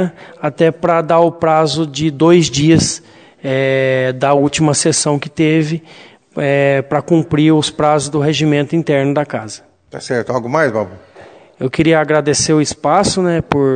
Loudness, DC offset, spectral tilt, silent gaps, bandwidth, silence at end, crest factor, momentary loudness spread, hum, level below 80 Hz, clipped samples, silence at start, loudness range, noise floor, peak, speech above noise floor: -14 LUFS; under 0.1%; -5 dB/octave; none; 9.4 kHz; 0 s; 14 dB; 11 LU; none; -46 dBFS; 0.1%; 0 s; 4 LU; -40 dBFS; 0 dBFS; 26 dB